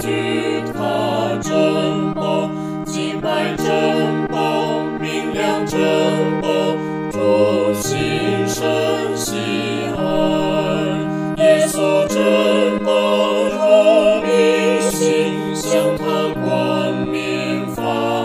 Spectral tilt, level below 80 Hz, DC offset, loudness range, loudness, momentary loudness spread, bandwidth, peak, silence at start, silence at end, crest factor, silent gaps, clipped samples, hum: -5 dB/octave; -48 dBFS; under 0.1%; 5 LU; -17 LUFS; 7 LU; 16 kHz; -2 dBFS; 0 s; 0 s; 16 dB; none; under 0.1%; none